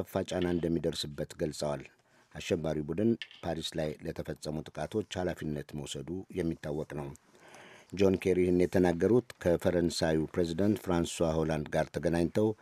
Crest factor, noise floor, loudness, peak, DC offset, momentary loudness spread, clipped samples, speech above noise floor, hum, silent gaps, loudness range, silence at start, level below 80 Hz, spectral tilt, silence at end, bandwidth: 20 dB; -54 dBFS; -32 LUFS; -12 dBFS; under 0.1%; 12 LU; under 0.1%; 23 dB; none; none; 8 LU; 0 s; -54 dBFS; -6 dB/octave; 0.1 s; 15 kHz